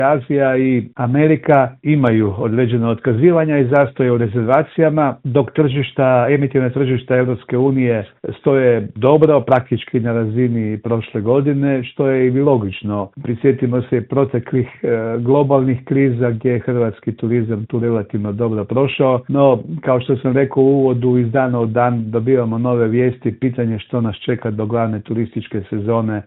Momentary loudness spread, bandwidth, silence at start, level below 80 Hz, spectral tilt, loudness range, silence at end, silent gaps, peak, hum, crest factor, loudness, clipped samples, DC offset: 7 LU; 4 kHz; 0 s; -54 dBFS; -11.5 dB/octave; 3 LU; 0.05 s; none; 0 dBFS; none; 16 dB; -16 LUFS; under 0.1%; under 0.1%